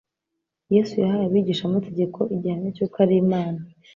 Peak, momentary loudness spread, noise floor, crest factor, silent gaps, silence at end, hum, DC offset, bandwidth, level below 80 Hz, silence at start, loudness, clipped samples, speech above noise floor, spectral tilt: -6 dBFS; 8 LU; -82 dBFS; 16 dB; none; 0.3 s; none; under 0.1%; 7.2 kHz; -62 dBFS; 0.7 s; -22 LUFS; under 0.1%; 60 dB; -8.5 dB/octave